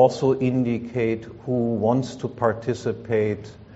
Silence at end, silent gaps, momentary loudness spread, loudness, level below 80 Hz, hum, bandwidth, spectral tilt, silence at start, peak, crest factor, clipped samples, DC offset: 0 s; none; 7 LU; -24 LUFS; -56 dBFS; none; 8 kHz; -7 dB/octave; 0 s; -4 dBFS; 18 dB; under 0.1%; under 0.1%